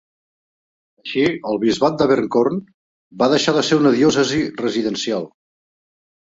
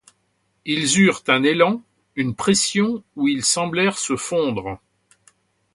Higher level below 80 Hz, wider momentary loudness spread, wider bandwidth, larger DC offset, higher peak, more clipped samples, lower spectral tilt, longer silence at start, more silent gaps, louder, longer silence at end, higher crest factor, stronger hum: about the same, -56 dBFS vs -56 dBFS; second, 10 LU vs 13 LU; second, 7.8 kHz vs 11.5 kHz; neither; about the same, -2 dBFS vs -2 dBFS; neither; first, -5 dB/octave vs -3.5 dB/octave; first, 1.05 s vs 0.65 s; first, 2.74-3.11 s vs none; about the same, -18 LUFS vs -19 LUFS; about the same, 1 s vs 1 s; about the same, 16 dB vs 20 dB; neither